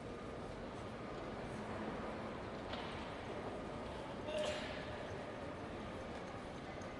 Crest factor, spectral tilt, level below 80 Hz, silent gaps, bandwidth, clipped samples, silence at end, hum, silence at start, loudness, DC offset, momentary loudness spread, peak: 16 dB; -5.5 dB/octave; -60 dBFS; none; 11.5 kHz; under 0.1%; 0 s; none; 0 s; -46 LUFS; under 0.1%; 6 LU; -28 dBFS